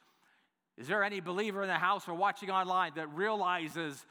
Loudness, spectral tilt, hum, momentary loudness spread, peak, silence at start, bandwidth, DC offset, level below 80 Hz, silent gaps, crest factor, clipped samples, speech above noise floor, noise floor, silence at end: -33 LUFS; -4.5 dB/octave; none; 5 LU; -14 dBFS; 0.8 s; over 20 kHz; under 0.1%; under -90 dBFS; none; 20 dB; under 0.1%; 40 dB; -74 dBFS; 0.1 s